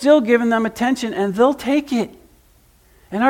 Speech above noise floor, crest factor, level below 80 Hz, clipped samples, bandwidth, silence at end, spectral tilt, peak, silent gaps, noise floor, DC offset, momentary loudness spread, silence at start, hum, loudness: 36 dB; 16 dB; -54 dBFS; under 0.1%; 16.5 kHz; 0 s; -5.5 dB/octave; -2 dBFS; none; -53 dBFS; under 0.1%; 9 LU; 0 s; none; -18 LUFS